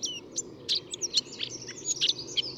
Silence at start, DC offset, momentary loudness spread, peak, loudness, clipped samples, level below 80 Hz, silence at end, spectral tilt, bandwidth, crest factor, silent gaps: 0 s; under 0.1%; 9 LU; -12 dBFS; -29 LUFS; under 0.1%; -68 dBFS; 0 s; 0 dB/octave; 17.5 kHz; 22 dB; none